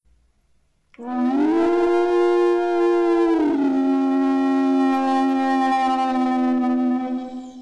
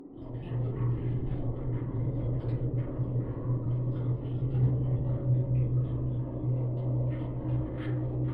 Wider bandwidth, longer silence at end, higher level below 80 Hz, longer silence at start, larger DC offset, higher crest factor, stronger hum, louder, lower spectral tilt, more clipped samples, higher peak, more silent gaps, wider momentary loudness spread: first, 9.4 kHz vs 3.4 kHz; about the same, 0 s vs 0 s; second, -58 dBFS vs -42 dBFS; first, 1 s vs 0 s; neither; about the same, 8 dB vs 12 dB; neither; first, -19 LUFS vs -31 LUFS; second, -5 dB/octave vs -12.5 dB/octave; neither; first, -10 dBFS vs -18 dBFS; neither; about the same, 5 LU vs 6 LU